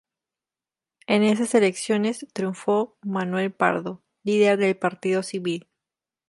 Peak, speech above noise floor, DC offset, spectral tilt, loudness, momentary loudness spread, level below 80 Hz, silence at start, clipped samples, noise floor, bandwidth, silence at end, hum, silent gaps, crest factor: -4 dBFS; over 67 dB; under 0.1%; -5 dB/octave; -23 LUFS; 10 LU; -74 dBFS; 1.1 s; under 0.1%; under -90 dBFS; 11.5 kHz; 0.7 s; none; none; 20 dB